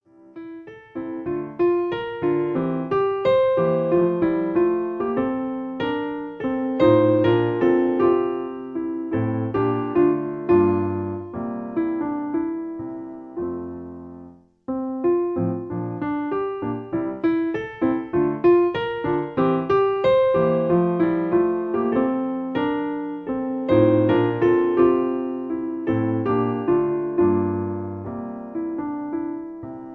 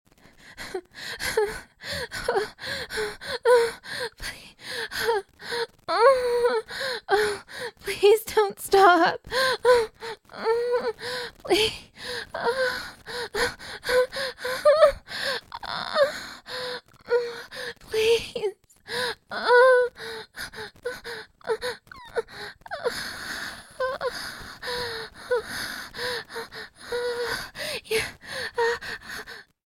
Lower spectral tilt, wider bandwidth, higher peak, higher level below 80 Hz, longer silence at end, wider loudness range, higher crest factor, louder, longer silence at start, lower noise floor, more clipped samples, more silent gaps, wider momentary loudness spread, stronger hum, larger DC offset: first, -10 dB/octave vs -2.5 dB/octave; second, 4.6 kHz vs 16.5 kHz; about the same, -6 dBFS vs -4 dBFS; about the same, -54 dBFS vs -54 dBFS; second, 0 s vs 0.25 s; second, 6 LU vs 10 LU; second, 16 dB vs 22 dB; first, -22 LUFS vs -25 LUFS; about the same, 0.35 s vs 0.45 s; second, -45 dBFS vs -52 dBFS; neither; neither; second, 13 LU vs 16 LU; neither; neither